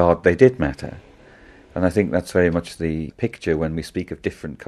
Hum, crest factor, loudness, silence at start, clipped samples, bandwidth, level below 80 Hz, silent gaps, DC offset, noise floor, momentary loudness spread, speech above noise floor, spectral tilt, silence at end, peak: none; 20 dB; -21 LUFS; 0 s; under 0.1%; 13 kHz; -40 dBFS; none; under 0.1%; -47 dBFS; 13 LU; 27 dB; -7 dB/octave; 0.05 s; 0 dBFS